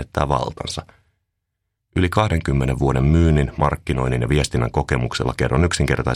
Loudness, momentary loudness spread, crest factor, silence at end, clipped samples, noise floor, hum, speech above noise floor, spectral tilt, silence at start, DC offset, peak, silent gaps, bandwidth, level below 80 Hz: -20 LUFS; 7 LU; 18 dB; 0 s; under 0.1%; -77 dBFS; none; 58 dB; -6 dB/octave; 0 s; under 0.1%; -2 dBFS; none; 14.5 kHz; -28 dBFS